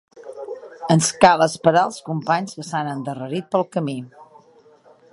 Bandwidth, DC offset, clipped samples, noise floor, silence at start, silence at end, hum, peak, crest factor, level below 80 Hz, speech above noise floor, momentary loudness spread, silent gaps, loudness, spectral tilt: 11.5 kHz; under 0.1%; under 0.1%; -52 dBFS; 0.15 s; 0.9 s; none; 0 dBFS; 22 dB; -60 dBFS; 32 dB; 20 LU; none; -20 LUFS; -4.5 dB/octave